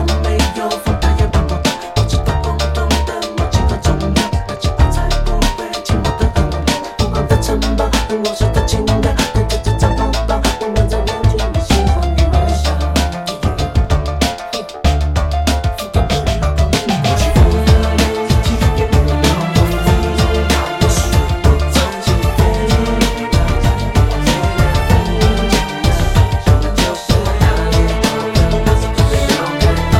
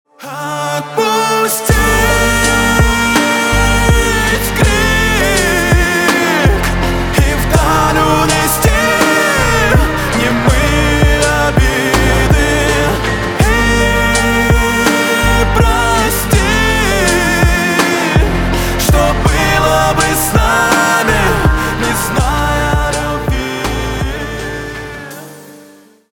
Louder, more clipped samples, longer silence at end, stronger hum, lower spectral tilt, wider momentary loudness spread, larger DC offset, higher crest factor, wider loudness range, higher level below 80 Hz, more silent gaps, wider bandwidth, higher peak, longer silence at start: second, -15 LUFS vs -12 LUFS; neither; second, 0 s vs 0.5 s; neither; first, -5.5 dB/octave vs -4 dB/octave; second, 4 LU vs 7 LU; neither; about the same, 12 dB vs 12 dB; about the same, 3 LU vs 3 LU; about the same, -16 dBFS vs -18 dBFS; neither; second, 16 kHz vs 19.5 kHz; about the same, 0 dBFS vs 0 dBFS; second, 0 s vs 0.2 s